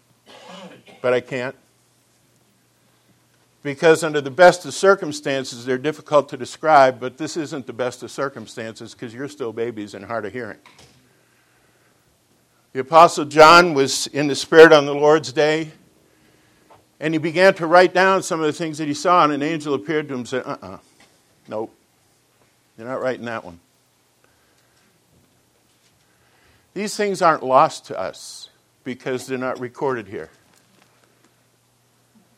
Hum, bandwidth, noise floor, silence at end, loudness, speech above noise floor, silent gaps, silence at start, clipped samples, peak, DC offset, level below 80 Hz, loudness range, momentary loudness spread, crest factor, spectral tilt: none; 15 kHz; -61 dBFS; 2.1 s; -18 LUFS; 43 dB; none; 0.5 s; under 0.1%; 0 dBFS; under 0.1%; -62 dBFS; 18 LU; 20 LU; 20 dB; -4 dB/octave